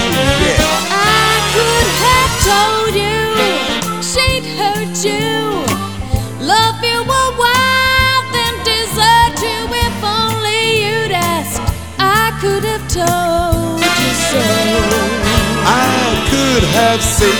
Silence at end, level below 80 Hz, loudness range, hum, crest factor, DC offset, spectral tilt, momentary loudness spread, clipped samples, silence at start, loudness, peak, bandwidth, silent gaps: 0 s; -28 dBFS; 3 LU; none; 14 dB; 2%; -3.5 dB/octave; 6 LU; under 0.1%; 0 s; -13 LUFS; 0 dBFS; over 20 kHz; none